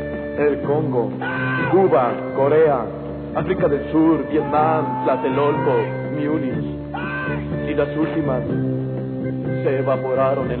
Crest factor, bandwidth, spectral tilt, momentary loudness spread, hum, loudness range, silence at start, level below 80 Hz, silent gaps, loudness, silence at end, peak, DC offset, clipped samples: 14 dB; 4.4 kHz; -12 dB/octave; 9 LU; none; 4 LU; 0 s; -44 dBFS; none; -20 LUFS; 0 s; -4 dBFS; under 0.1%; under 0.1%